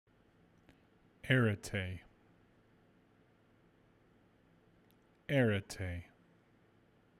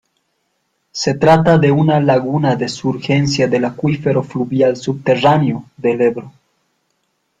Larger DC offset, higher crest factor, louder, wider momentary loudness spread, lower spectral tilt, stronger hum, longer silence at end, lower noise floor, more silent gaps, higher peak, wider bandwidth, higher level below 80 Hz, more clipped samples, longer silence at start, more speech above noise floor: neither; first, 24 dB vs 14 dB; second, -35 LUFS vs -15 LUFS; first, 20 LU vs 8 LU; about the same, -6 dB/octave vs -6.5 dB/octave; neither; about the same, 1.2 s vs 1.1 s; about the same, -69 dBFS vs -67 dBFS; neither; second, -16 dBFS vs 0 dBFS; first, 15 kHz vs 9 kHz; second, -66 dBFS vs -50 dBFS; neither; first, 1.25 s vs 0.95 s; second, 35 dB vs 53 dB